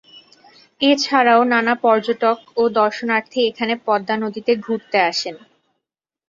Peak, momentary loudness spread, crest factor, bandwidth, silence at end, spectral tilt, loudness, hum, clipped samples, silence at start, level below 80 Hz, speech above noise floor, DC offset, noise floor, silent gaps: -2 dBFS; 7 LU; 18 dB; 7.4 kHz; 0.9 s; -3.5 dB/octave; -18 LUFS; none; under 0.1%; 0.8 s; -68 dBFS; 65 dB; under 0.1%; -82 dBFS; none